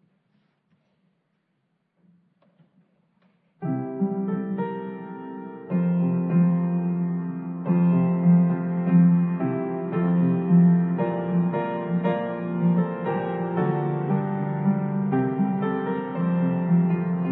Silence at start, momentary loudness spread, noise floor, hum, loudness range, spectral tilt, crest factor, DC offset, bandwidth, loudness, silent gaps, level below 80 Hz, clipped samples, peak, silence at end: 3.6 s; 10 LU; -73 dBFS; none; 10 LU; -13 dB/octave; 14 dB; under 0.1%; 3.5 kHz; -23 LUFS; none; -68 dBFS; under 0.1%; -8 dBFS; 0 s